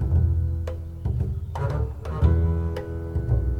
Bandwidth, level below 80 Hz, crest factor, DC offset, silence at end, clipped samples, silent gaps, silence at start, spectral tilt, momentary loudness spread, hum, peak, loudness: 5.2 kHz; -30 dBFS; 16 dB; under 0.1%; 0 s; under 0.1%; none; 0 s; -9.5 dB/octave; 8 LU; none; -8 dBFS; -26 LUFS